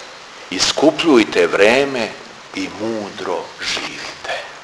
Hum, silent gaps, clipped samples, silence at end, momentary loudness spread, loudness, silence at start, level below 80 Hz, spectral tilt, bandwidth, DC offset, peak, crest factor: none; none; under 0.1%; 0 s; 14 LU; -17 LUFS; 0 s; -54 dBFS; -3 dB/octave; 11 kHz; under 0.1%; 0 dBFS; 18 dB